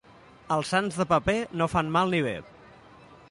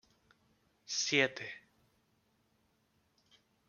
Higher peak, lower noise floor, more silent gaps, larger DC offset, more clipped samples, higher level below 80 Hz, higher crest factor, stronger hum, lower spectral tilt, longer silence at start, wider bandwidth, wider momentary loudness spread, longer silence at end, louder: first, -10 dBFS vs -14 dBFS; second, -53 dBFS vs -76 dBFS; neither; neither; neither; first, -52 dBFS vs -82 dBFS; second, 18 dB vs 28 dB; neither; first, -5.5 dB/octave vs -2 dB/octave; second, 0.45 s vs 0.9 s; about the same, 11.5 kHz vs 11 kHz; second, 6 LU vs 18 LU; second, 0.15 s vs 2.1 s; first, -26 LUFS vs -33 LUFS